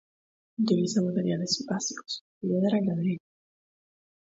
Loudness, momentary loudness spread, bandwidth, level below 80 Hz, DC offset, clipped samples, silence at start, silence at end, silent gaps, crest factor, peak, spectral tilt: -28 LUFS; 11 LU; 8 kHz; -72 dBFS; under 0.1%; under 0.1%; 0.6 s; 1.15 s; 2.21-2.41 s; 18 dB; -12 dBFS; -5.5 dB/octave